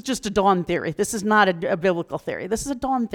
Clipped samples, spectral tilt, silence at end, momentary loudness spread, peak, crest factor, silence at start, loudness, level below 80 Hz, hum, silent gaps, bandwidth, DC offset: under 0.1%; -4.5 dB/octave; 0 s; 9 LU; -6 dBFS; 16 dB; 0.05 s; -22 LUFS; -48 dBFS; none; none; 18.5 kHz; under 0.1%